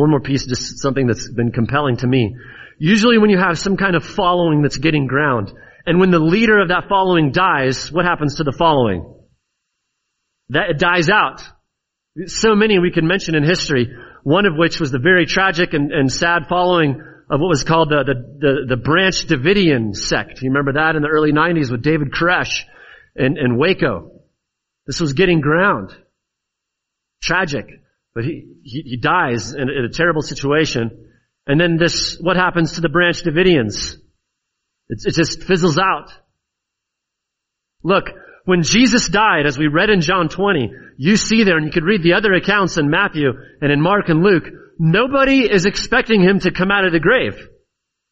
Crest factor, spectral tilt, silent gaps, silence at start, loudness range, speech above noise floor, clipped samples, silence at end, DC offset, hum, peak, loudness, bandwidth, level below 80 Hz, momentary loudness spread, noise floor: 16 dB; -4 dB/octave; none; 0 s; 5 LU; 64 dB; under 0.1%; 0.65 s; under 0.1%; none; 0 dBFS; -15 LUFS; 8 kHz; -40 dBFS; 10 LU; -80 dBFS